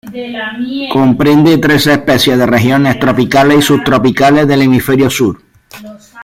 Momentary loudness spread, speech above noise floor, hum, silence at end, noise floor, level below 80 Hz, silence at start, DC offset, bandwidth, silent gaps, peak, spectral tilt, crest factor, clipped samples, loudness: 11 LU; 23 dB; none; 0 s; -32 dBFS; -40 dBFS; 0.05 s; under 0.1%; 16.5 kHz; none; 0 dBFS; -5.5 dB/octave; 10 dB; under 0.1%; -9 LUFS